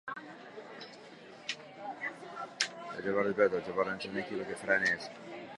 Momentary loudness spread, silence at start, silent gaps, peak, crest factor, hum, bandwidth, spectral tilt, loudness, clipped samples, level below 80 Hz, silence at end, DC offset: 19 LU; 0.05 s; none; -8 dBFS; 28 dB; none; 11.5 kHz; -3.5 dB/octave; -34 LUFS; under 0.1%; -74 dBFS; 0 s; under 0.1%